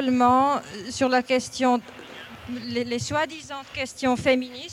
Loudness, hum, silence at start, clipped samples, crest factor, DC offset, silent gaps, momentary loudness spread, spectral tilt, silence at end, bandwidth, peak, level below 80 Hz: -24 LUFS; none; 0 s; under 0.1%; 16 dB; under 0.1%; none; 16 LU; -4 dB/octave; 0 s; 14 kHz; -8 dBFS; -56 dBFS